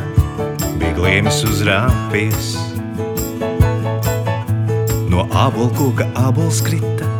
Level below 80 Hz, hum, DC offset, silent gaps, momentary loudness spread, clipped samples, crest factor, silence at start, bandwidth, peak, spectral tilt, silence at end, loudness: -28 dBFS; none; under 0.1%; none; 7 LU; under 0.1%; 16 dB; 0 s; over 20 kHz; 0 dBFS; -5.5 dB/octave; 0 s; -17 LUFS